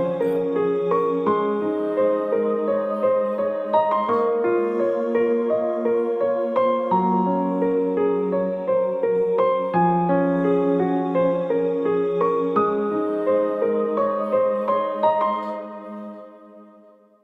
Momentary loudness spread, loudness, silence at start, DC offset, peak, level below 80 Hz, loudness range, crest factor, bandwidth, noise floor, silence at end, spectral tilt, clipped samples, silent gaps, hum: 3 LU; -21 LUFS; 0 s; under 0.1%; -6 dBFS; -66 dBFS; 1 LU; 14 dB; 4.6 kHz; -51 dBFS; 0.6 s; -9.5 dB/octave; under 0.1%; none; none